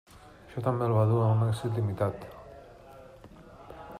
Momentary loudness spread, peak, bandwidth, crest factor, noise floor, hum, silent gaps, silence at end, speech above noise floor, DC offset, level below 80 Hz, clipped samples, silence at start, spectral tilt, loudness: 26 LU; -14 dBFS; 10.5 kHz; 16 dB; -50 dBFS; none; none; 0 s; 24 dB; under 0.1%; -58 dBFS; under 0.1%; 0.25 s; -8.5 dB/octave; -28 LUFS